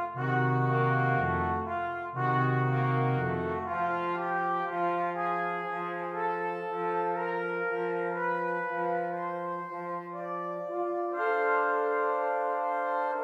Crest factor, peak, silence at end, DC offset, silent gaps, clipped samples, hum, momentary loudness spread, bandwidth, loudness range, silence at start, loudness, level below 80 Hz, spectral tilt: 14 dB; -16 dBFS; 0 s; under 0.1%; none; under 0.1%; none; 7 LU; 5.2 kHz; 4 LU; 0 s; -30 LUFS; -62 dBFS; -9 dB/octave